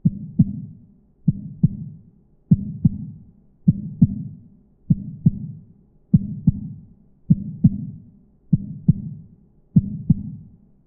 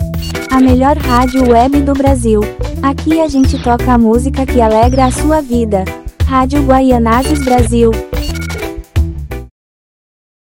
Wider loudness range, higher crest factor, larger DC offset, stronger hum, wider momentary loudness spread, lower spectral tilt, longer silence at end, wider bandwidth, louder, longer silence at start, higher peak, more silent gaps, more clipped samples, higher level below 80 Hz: about the same, 2 LU vs 2 LU; first, 20 dB vs 10 dB; second, under 0.1% vs 0.1%; neither; first, 17 LU vs 10 LU; first, -20 dB/octave vs -6.5 dB/octave; second, 0.4 s vs 1 s; second, 0.9 kHz vs 17 kHz; second, -22 LUFS vs -11 LUFS; about the same, 0.05 s vs 0 s; about the same, -2 dBFS vs 0 dBFS; neither; second, under 0.1% vs 0.5%; second, -42 dBFS vs -20 dBFS